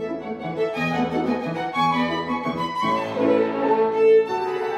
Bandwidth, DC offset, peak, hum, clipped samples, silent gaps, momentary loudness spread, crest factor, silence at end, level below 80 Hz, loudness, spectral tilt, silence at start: 9.4 kHz; under 0.1%; -8 dBFS; none; under 0.1%; none; 9 LU; 14 dB; 0 s; -58 dBFS; -22 LUFS; -6.5 dB/octave; 0 s